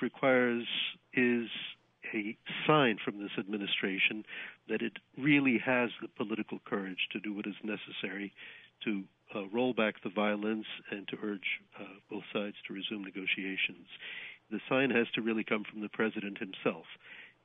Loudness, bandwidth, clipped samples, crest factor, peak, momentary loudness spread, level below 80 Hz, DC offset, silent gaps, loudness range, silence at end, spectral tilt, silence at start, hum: -34 LUFS; 4 kHz; under 0.1%; 20 dB; -14 dBFS; 15 LU; -84 dBFS; under 0.1%; none; 6 LU; 0.15 s; -8.5 dB/octave; 0 s; none